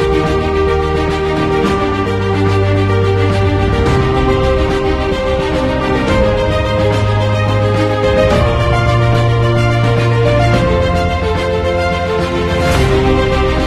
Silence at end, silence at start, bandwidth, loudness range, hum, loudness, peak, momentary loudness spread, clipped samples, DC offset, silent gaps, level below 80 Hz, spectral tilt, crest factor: 0 s; 0 s; 13 kHz; 2 LU; none; -13 LUFS; 0 dBFS; 3 LU; under 0.1%; under 0.1%; none; -22 dBFS; -7 dB/octave; 12 dB